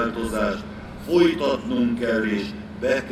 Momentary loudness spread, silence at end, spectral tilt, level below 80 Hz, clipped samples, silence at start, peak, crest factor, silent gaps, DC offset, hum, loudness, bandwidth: 13 LU; 0 s; -6 dB/octave; -44 dBFS; under 0.1%; 0 s; -6 dBFS; 16 dB; none; under 0.1%; none; -23 LUFS; 13.5 kHz